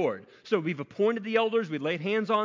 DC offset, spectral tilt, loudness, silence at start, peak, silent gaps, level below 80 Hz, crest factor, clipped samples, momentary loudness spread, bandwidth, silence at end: under 0.1%; -6.5 dB/octave; -28 LUFS; 0 s; -12 dBFS; none; -76 dBFS; 16 dB; under 0.1%; 5 LU; 7.6 kHz; 0 s